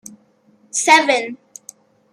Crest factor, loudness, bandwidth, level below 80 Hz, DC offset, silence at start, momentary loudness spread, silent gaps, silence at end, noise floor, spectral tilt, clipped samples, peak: 20 dB; -15 LUFS; 15.5 kHz; -76 dBFS; under 0.1%; 0.75 s; 19 LU; none; 0.8 s; -55 dBFS; 0 dB/octave; under 0.1%; 0 dBFS